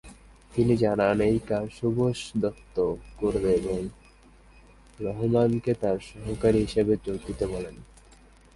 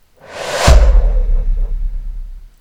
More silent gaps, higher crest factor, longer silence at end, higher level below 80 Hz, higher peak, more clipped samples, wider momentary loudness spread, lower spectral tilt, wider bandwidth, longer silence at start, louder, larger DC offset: neither; first, 18 dB vs 12 dB; first, 0.7 s vs 0.15 s; second, -46 dBFS vs -14 dBFS; second, -8 dBFS vs 0 dBFS; second, under 0.1% vs 0.7%; second, 11 LU vs 21 LU; first, -7.5 dB/octave vs -4.5 dB/octave; about the same, 11.5 kHz vs 12 kHz; second, 0.05 s vs 0.3 s; second, -26 LUFS vs -15 LUFS; neither